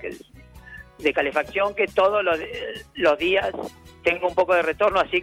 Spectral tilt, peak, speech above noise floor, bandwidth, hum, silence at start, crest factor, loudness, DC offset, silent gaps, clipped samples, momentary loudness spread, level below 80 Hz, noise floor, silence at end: -4.5 dB/octave; -8 dBFS; 24 dB; 15 kHz; none; 0 s; 16 dB; -22 LUFS; under 0.1%; none; under 0.1%; 17 LU; -52 dBFS; -46 dBFS; 0 s